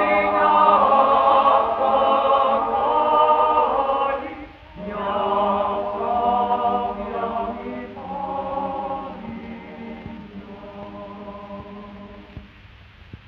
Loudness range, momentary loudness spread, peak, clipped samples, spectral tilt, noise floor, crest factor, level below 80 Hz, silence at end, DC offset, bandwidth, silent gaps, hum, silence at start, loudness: 19 LU; 22 LU; -4 dBFS; under 0.1%; -7.5 dB/octave; -46 dBFS; 18 dB; -50 dBFS; 0.1 s; under 0.1%; 5.8 kHz; none; none; 0 s; -19 LUFS